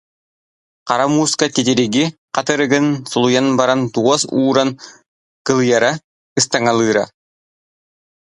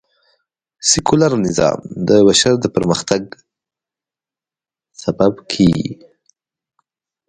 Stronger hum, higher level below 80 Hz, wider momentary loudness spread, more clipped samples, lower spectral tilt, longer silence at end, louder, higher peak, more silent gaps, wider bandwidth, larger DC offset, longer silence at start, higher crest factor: neither; second, -60 dBFS vs -46 dBFS; second, 7 LU vs 11 LU; neither; about the same, -4 dB/octave vs -4.5 dB/octave; about the same, 1.25 s vs 1.35 s; about the same, -16 LUFS vs -15 LUFS; about the same, 0 dBFS vs 0 dBFS; first, 2.18-2.28 s, 5.08-5.45 s, 6.04-6.36 s vs none; about the same, 11.5 kHz vs 11 kHz; neither; about the same, 0.85 s vs 0.8 s; about the same, 16 dB vs 18 dB